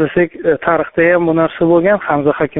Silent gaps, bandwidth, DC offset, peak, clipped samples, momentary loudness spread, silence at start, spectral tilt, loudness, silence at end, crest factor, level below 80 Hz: none; 3.9 kHz; under 0.1%; 0 dBFS; under 0.1%; 4 LU; 0 s; -6 dB/octave; -13 LUFS; 0 s; 12 dB; -46 dBFS